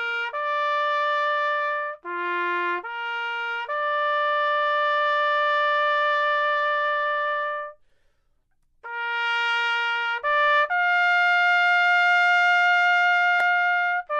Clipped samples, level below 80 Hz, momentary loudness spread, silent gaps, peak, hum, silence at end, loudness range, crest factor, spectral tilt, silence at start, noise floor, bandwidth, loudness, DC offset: under 0.1%; -68 dBFS; 9 LU; none; -10 dBFS; 60 Hz at -80 dBFS; 0 s; 7 LU; 12 dB; -0.5 dB/octave; 0 s; -66 dBFS; 8.2 kHz; -21 LUFS; under 0.1%